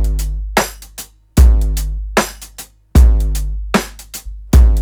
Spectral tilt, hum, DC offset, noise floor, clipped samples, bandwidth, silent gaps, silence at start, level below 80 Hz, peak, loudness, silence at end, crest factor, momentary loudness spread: -5.5 dB/octave; none; under 0.1%; -37 dBFS; under 0.1%; over 20 kHz; none; 0 s; -14 dBFS; 0 dBFS; -16 LUFS; 0 s; 12 dB; 19 LU